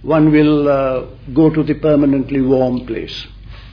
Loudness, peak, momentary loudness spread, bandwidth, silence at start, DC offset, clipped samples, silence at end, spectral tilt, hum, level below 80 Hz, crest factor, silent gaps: -14 LUFS; -2 dBFS; 13 LU; 5.4 kHz; 0 s; under 0.1%; under 0.1%; 0.05 s; -9 dB/octave; none; -36 dBFS; 14 dB; none